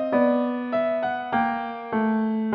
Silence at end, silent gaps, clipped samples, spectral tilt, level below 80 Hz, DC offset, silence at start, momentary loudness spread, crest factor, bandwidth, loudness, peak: 0 s; none; under 0.1%; -5 dB/octave; -62 dBFS; under 0.1%; 0 s; 5 LU; 14 dB; 5.2 kHz; -24 LUFS; -10 dBFS